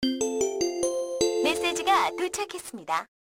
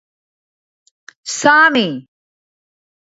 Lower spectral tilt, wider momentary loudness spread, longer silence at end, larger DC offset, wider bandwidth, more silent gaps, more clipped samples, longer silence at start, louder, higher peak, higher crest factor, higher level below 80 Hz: about the same, -2 dB/octave vs -2.5 dB/octave; second, 8 LU vs 21 LU; second, 0.3 s vs 1.05 s; neither; first, 17 kHz vs 8 kHz; neither; neither; second, 0 s vs 1.25 s; second, -27 LUFS vs -13 LUFS; second, -10 dBFS vs 0 dBFS; about the same, 16 dB vs 18 dB; first, -58 dBFS vs -68 dBFS